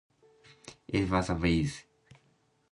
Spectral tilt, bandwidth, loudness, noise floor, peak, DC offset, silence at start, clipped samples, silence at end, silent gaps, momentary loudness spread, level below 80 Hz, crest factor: -6 dB/octave; 11.5 kHz; -30 LUFS; -70 dBFS; -10 dBFS; under 0.1%; 0.65 s; under 0.1%; 0.9 s; none; 22 LU; -46 dBFS; 22 dB